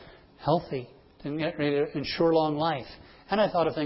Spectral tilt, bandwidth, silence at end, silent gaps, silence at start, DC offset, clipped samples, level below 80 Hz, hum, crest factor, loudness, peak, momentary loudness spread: -10 dB/octave; 5.8 kHz; 0 s; none; 0 s; under 0.1%; under 0.1%; -56 dBFS; none; 18 dB; -28 LUFS; -10 dBFS; 13 LU